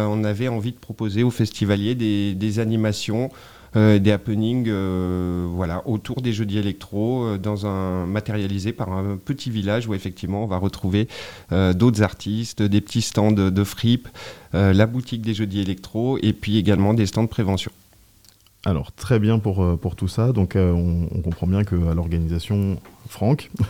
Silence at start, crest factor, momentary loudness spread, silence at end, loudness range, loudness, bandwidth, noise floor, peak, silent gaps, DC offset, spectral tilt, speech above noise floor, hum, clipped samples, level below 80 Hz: 0 s; 16 dB; 8 LU; 0 s; 4 LU; -22 LUFS; 16 kHz; -54 dBFS; -4 dBFS; none; 0.3%; -7 dB/octave; 33 dB; none; under 0.1%; -44 dBFS